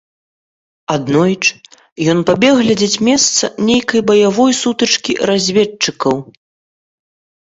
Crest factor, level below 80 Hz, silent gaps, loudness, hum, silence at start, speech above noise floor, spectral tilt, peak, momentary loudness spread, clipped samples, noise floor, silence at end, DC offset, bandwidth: 14 dB; -52 dBFS; 1.92-1.96 s; -13 LUFS; none; 0.9 s; over 77 dB; -3.5 dB/octave; 0 dBFS; 7 LU; under 0.1%; under -90 dBFS; 1.15 s; under 0.1%; 8 kHz